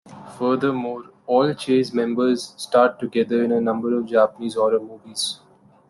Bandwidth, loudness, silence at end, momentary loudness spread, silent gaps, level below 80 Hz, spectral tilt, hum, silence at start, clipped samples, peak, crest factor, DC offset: 12.5 kHz; -21 LUFS; 0.55 s; 9 LU; none; -66 dBFS; -5 dB/octave; none; 0.05 s; under 0.1%; -4 dBFS; 18 dB; under 0.1%